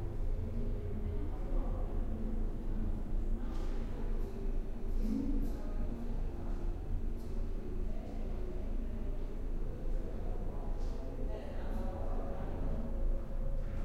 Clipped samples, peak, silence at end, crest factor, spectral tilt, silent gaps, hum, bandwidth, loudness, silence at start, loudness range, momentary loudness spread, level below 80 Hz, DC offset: under 0.1%; -24 dBFS; 0 s; 12 dB; -8.5 dB/octave; none; none; 4.6 kHz; -42 LUFS; 0 s; 2 LU; 3 LU; -36 dBFS; under 0.1%